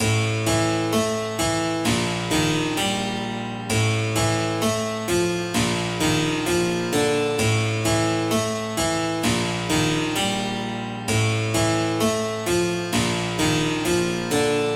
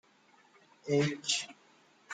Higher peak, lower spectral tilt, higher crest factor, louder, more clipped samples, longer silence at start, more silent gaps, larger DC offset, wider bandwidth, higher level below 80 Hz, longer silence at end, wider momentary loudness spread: first, -10 dBFS vs -18 dBFS; about the same, -4.5 dB/octave vs -3.5 dB/octave; second, 14 dB vs 20 dB; first, -22 LUFS vs -32 LUFS; neither; second, 0 s vs 0.85 s; neither; neither; first, 16.5 kHz vs 9.6 kHz; first, -44 dBFS vs -76 dBFS; about the same, 0 s vs 0 s; second, 3 LU vs 16 LU